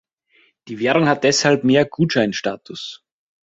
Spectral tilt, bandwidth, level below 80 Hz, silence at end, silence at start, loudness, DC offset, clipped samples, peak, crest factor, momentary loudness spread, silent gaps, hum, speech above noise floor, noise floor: -4.5 dB/octave; 8 kHz; -58 dBFS; 0.55 s; 0.65 s; -17 LUFS; under 0.1%; under 0.1%; -2 dBFS; 18 dB; 16 LU; none; none; 41 dB; -59 dBFS